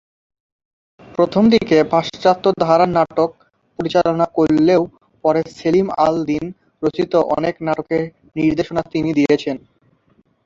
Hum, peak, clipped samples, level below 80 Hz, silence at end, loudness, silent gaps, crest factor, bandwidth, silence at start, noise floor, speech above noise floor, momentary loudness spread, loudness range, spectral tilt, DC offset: none; 0 dBFS; under 0.1%; -52 dBFS; 0.9 s; -17 LUFS; none; 16 dB; 7.6 kHz; 1.2 s; -58 dBFS; 42 dB; 9 LU; 3 LU; -7 dB/octave; under 0.1%